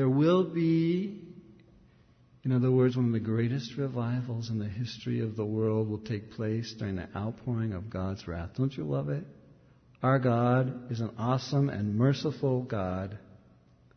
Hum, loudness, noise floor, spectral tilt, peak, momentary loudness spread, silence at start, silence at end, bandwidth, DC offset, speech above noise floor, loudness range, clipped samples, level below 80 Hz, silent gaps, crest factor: none; -30 LUFS; -61 dBFS; -8 dB/octave; -14 dBFS; 11 LU; 0 s; 0.75 s; 6.6 kHz; under 0.1%; 32 dB; 5 LU; under 0.1%; -60 dBFS; none; 16 dB